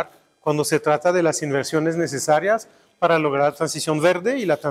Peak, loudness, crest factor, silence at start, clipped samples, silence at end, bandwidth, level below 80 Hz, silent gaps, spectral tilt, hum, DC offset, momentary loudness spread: -4 dBFS; -21 LUFS; 16 dB; 0 s; under 0.1%; 0 s; 16 kHz; -66 dBFS; none; -4.5 dB/octave; none; under 0.1%; 6 LU